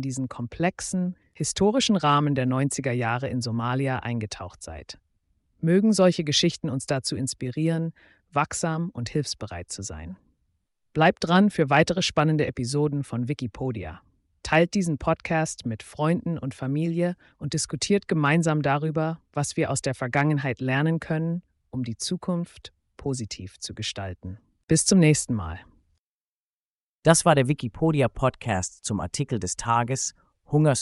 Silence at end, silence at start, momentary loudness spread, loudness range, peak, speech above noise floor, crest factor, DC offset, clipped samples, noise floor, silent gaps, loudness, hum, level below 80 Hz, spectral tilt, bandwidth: 0 s; 0 s; 14 LU; 5 LU; -6 dBFS; over 65 dB; 20 dB; under 0.1%; under 0.1%; under -90 dBFS; 24.63-24.68 s, 25.98-27.03 s; -25 LUFS; none; -52 dBFS; -5 dB/octave; 11.5 kHz